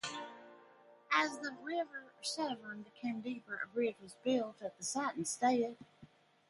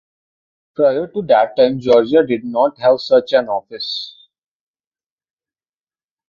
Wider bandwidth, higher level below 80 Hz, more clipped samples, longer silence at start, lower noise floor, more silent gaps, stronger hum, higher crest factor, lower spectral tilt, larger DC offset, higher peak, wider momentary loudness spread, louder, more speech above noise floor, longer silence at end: first, 11.5 kHz vs 7 kHz; second, -84 dBFS vs -60 dBFS; neither; second, 0.05 s vs 0.8 s; second, -63 dBFS vs under -90 dBFS; neither; neither; first, 22 dB vs 16 dB; second, -2.5 dB/octave vs -6.5 dB/octave; neither; second, -16 dBFS vs -2 dBFS; about the same, 12 LU vs 11 LU; second, -38 LUFS vs -15 LUFS; second, 25 dB vs over 75 dB; second, 0.45 s vs 2.2 s